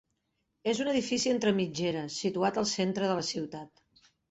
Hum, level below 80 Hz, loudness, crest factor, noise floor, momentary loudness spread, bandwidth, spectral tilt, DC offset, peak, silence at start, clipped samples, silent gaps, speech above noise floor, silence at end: none; -68 dBFS; -30 LUFS; 16 dB; -79 dBFS; 8 LU; 8.2 kHz; -4.5 dB/octave; under 0.1%; -14 dBFS; 0.65 s; under 0.1%; none; 49 dB; 0.65 s